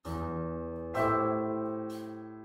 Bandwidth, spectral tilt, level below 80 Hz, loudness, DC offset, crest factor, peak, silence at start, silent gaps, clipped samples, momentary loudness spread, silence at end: 16 kHz; -8 dB/octave; -52 dBFS; -33 LUFS; under 0.1%; 16 dB; -16 dBFS; 0.05 s; none; under 0.1%; 11 LU; 0 s